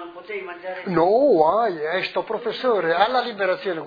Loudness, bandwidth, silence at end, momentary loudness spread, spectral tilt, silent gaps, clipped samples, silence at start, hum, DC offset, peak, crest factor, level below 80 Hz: -21 LUFS; 5 kHz; 0 s; 15 LU; -7 dB/octave; none; under 0.1%; 0 s; none; under 0.1%; -4 dBFS; 18 dB; -62 dBFS